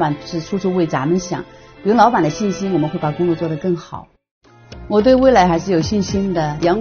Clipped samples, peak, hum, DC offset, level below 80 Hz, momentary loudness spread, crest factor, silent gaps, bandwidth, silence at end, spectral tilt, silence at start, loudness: under 0.1%; 0 dBFS; none; under 0.1%; -40 dBFS; 13 LU; 16 dB; 4.31-4.41 s; 6.8 kHz; 0 s; -6 dB/octave; 0 s; -17 LUFS